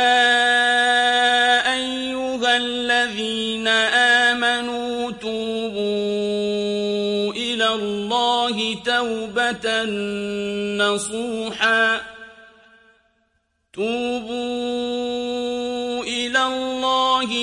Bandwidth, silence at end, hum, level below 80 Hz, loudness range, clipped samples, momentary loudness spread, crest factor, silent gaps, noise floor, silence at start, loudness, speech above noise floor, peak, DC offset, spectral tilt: 11.5 kHz; 0 s; none; -58 dBFS; 7 LU; under 0.1%; 10 LU; 16 dB; none; -69 dBFS; 0 s; -20 LUFS; 45 dB; -4 dBFS; under 0.1%; -2.5 dB/octave